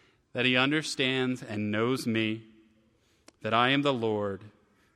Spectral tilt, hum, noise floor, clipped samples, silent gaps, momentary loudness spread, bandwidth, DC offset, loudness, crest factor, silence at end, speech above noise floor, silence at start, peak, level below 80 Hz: -5 dB/octave; none; -67 dBFS; under 0.1%; none; 13 LU; 14.5 kHz; under 0.1%; -28 LUFS; 20 dB; 0.5 s; 39 dB; 0.35 s; -10 dBFS; -72 dBFS